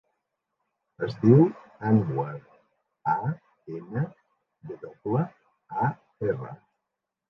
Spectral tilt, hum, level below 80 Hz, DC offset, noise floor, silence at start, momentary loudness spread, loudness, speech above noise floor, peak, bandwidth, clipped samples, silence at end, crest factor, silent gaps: -11 dB/octave; none; -64 dBFS; under 0.1%; -85 dBFS; 1 s; 21 LU; -27 LUFS; 60 dB; -6 dBFS; 6 kHz; under 0.1%; 0.75 s; 22 dB; none